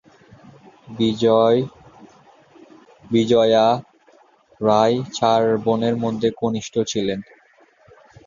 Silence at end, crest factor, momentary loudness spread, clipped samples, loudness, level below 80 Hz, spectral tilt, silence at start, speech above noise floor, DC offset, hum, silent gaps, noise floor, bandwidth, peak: 1.05 s; 18 dB; 9 LU; under 0.1%; -19 LUFS; -58 dBFS; -6 dB/octave; 0.9 s; 37 dB; under 0.1%; none; none; -54 dBFS; 7.4 kHz; -4 dBFS